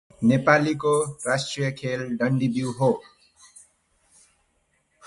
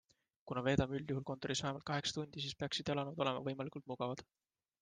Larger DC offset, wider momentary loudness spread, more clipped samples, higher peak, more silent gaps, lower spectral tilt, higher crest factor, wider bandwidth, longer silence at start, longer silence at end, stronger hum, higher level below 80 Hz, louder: neither; about the same, 9 LU vs 8 LU; neither; first, -4 dBFS vs -18 dBFS; neither; about the same, -5.5 dB/octave vs -5 dB/octave; about the same, 22 dB vs 24 dB; first, 11.5 kHz vs 9.8 kHz; second, 0.2 s vs 0.45 s; first, 2.05 s vs 0.6 s; neither; about the same, -62 dBFS vs -64 dBFS; first, -23 LUFS vs -40 LUFS